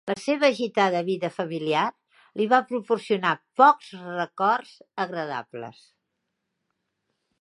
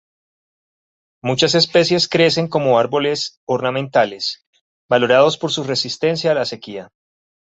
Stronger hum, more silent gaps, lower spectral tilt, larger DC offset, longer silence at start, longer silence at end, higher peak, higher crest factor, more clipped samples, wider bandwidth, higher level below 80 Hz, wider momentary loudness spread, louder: neither; second, none vs 3.37-3.47 s, 4.46-4.53 s, 4.61-4.89 s; about the same, -5 dB/octave vs -4.5 dB/octave; neither; second, 0.05 s vs 1.25 s; first, 1.7 s vs 0.55 s; about the same, -2 dBFS vs -2 dBFS; first, 22 dB vs 16 dB; neither; first, 11.5 kHz vs 8 kHz; second, -80 dBFS vs -60 dBFS; first, 16 LU vs 11 LU; second, -24 LUFS vs -17 LUFS